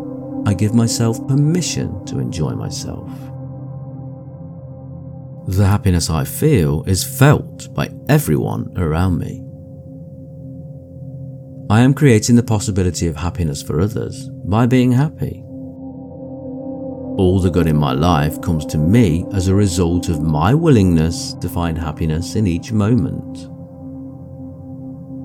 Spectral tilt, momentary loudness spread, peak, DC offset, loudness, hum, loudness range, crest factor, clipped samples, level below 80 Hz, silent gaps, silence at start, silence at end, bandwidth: -6.5 dB/octave; 20 LU; 0 dBFS; under 0.1%; -17 LUFS; none; 7 LU; 16 dB; under 0.1%; -36 dBFS; none; 0 s; 0 s; 18 kHz